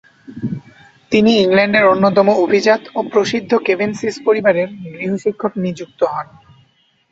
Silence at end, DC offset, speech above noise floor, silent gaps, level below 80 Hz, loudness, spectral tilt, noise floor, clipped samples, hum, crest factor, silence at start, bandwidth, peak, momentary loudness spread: 0.9 s; under 0.1%; 42 dB; none; -56 dBFS; -15 LUFS; -5.5 dB/octave; -57 dBFS; under 0.1%; none; 14 dB; 0.3 s; 8 kHz; -2 dBFS; 14 LU